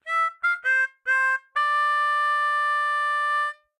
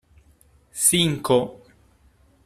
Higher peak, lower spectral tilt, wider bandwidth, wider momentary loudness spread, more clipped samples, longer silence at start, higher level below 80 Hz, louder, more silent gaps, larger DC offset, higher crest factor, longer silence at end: second, -14 dBFS vs -2 dBFS; second, 3.5 dB/octave vs -3 dB/octave; second, 13 kHz vs 15.5 kHz; second, 3 LU vs 17 LU; neither; second, 0.05 s vs 0.75 s; second, -88 dBFS vs -56 dBFS; about the same, -22 LUFS vs -20 LUFS; neither; neither; second, 10 dB vs 22 dB; second, 0.25 s vs 0.9 s